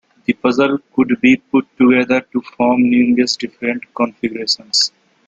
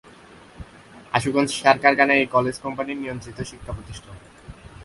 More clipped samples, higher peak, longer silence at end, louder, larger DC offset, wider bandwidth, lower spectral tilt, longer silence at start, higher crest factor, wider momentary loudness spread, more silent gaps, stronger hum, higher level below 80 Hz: neither; about the same, 0 dBFS vs 0 dBFS; first, 0.4 s vs 0 s; first, -15 LUFS vs -21 LUFS; neither; second, 9 kHz vs 11.5 kHz; about the same, -4 dB/octave vs -4.5 dB/octave; second, 0.3 s vs 0.6 s; second, 14 dB vs 24 dB; second, 8 LU vs 19 LU; neither; neither; second, -58 dBFS vs -48 dBFS